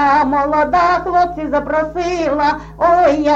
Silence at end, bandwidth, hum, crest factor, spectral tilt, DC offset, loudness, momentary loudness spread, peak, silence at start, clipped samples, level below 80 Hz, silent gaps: 0 s; 7.8 kHz; none; 12 dB; -5.5 dB/octave; under 0.1%; -15 LUFS; 6 LU; -2 dBFS; 0 s; under 0.1%; -36 dBFS; none